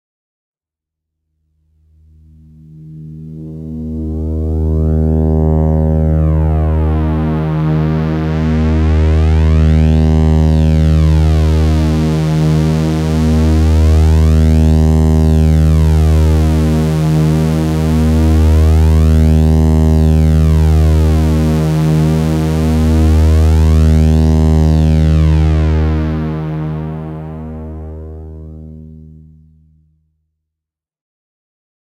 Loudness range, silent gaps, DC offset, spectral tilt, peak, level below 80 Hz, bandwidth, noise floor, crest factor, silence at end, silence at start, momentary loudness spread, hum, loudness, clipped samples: 11 LU; none; under 0.1%; -8.5 dB/octave; 0 dBFS; -16 dBFS; 10.5 kHz; -84 dBFS; 12 dB; 2.9 s; 2.7 s; 13 LU; none; -12 LUFS; under 0.1%